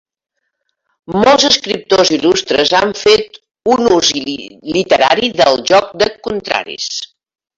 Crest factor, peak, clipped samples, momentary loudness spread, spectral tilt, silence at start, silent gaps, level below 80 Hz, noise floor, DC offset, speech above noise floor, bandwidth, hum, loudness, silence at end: 14 dB; 0 dBFS; under 0.1%; 11 LU; -3 dB/octave; 1.1 s; none; -48 dBFS; -70 dBFS; under 0.1%; 57 dB; 8 kHz; none; -12 LUFS; 0.55 s